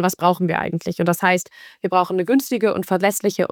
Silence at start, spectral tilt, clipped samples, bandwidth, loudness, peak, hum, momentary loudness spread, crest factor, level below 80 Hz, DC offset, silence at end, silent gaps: 0 s; -5 dB/octave; under 0.1%; 19.5 kHz; -20 LUFS; -4 dBFS; none; 5 LU; 16 dB; -62 dBFS; under 0.1%; 0.05 s; none